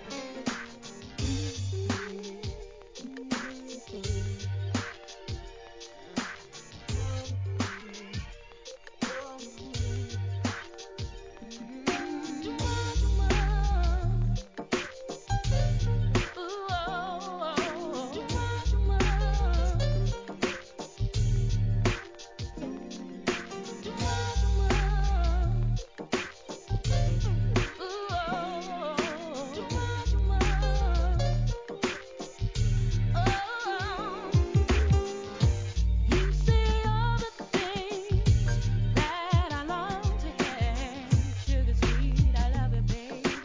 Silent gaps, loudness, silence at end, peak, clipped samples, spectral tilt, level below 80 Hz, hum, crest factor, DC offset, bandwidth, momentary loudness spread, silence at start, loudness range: none; -30 LUFS; 0 s; -12 dBFS; under 0.1%; -5.5 dB/octave; -32 dBFS; none; 18 dB; 0.1%; 7.6 kHz; 14 LU; 0 s; 9 LU